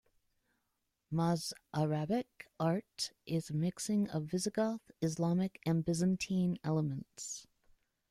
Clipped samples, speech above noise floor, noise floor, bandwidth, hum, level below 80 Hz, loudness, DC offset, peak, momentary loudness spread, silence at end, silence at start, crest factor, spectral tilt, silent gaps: under 0.1%; 49 dB; -84 dBFS; 14.5 kHz; none; -68 dBFS; -36 LUFS; under 0.1%; -20 dBFS; 7 LU; 0.65 s; 1.1 s; 16 dB; -6 dB/octave; none